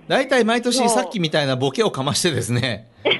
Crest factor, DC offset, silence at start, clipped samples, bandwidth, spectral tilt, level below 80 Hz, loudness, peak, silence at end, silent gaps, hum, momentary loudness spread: 14 dB; under 0.1%; 0.1 s; under 0.1%; 12 kHz; -4 dB/octave; -58 dBFS; -19 LUFS; -4 dBFS; 0 s; none; none; 5 LU